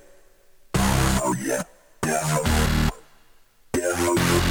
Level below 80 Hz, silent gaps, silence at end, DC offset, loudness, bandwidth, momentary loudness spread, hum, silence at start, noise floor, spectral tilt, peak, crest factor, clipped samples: -32 dBFS; none; 0 s; under 0.1%; -23 LUFS; 18.5 kHz; 8 LU; none; 0.75 s; -53 dBFS; -4.5 dB/octave; -6 dBFS; 18 dB; under 0.1%